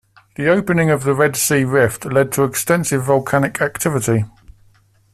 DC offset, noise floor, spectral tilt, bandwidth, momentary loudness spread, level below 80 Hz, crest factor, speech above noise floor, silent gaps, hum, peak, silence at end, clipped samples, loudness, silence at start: under 0.1%; -54 dBFS; -5 dB/octave; 15 kHz; 4 LU; -50 dBFS; 16 dB; 37 dB; none; none; -2 dBFS; 0.85 s; under 0.1%; -17 LUFS; 0.4 s